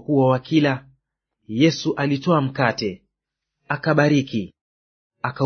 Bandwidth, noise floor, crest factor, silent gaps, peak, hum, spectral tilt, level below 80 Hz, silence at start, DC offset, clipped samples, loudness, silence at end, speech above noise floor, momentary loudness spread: 6.6 kHz; -82 dBFS; 20 dB; 4.61-5.10 s; -2 dBFS; none; -6.5 dB/octave; -60 dBFS; 0.1 s; under 0.1%; under 0.1%; -21 LUFS; 0 s; 63 dB; 12 LU